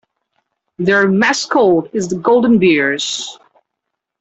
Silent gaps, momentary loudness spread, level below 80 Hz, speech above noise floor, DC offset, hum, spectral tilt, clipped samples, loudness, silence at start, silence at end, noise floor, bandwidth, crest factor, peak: none; 9 LU; -54 dBFS; 64 dB; under 0.1%; none; -4.5 dB/octave; under 0.1%; -14 LUFS; 0.8 s; 0.9 s; -77 dBFS; 8.2 kHz; 14 dB; -2 dBFS